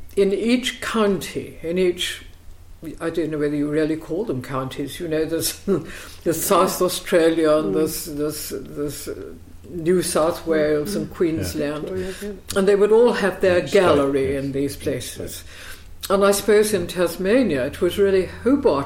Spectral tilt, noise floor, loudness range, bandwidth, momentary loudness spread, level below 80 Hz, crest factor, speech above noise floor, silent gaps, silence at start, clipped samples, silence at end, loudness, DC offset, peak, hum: -4.5 dB/octave; -40 dBFS; 5 LU; 16.5 kHz; 13 LU; -44 dBFS; 16 dB; 20 dB; none; 0 s; under 0.1%; 0 s; -21 LUFS; under 0.1%; -6 dBFS; none